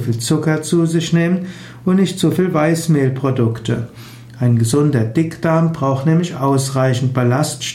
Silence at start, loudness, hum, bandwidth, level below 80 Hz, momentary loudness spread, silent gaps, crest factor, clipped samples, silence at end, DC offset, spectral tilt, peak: 0 s; -16 LUFS; none; 16 kHz; -52 dBFS; 7 LU; none; 12 dB; under 0.1%; 0 s; under 0.1%; -6 dB/octave; -4 dBFS